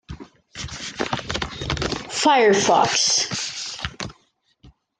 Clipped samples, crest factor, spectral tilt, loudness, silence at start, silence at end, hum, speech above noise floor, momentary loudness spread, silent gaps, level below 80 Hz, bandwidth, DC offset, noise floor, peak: under 0.1%; 20 dB; -2.5 dB/octave; -20 LUFS; 0.1 s; 0.3 s; none; 46 dB; 19 LU; none; -44 dBFS; 10.5 kHz; under 0.1%; -63 dBFS; -4 dBFS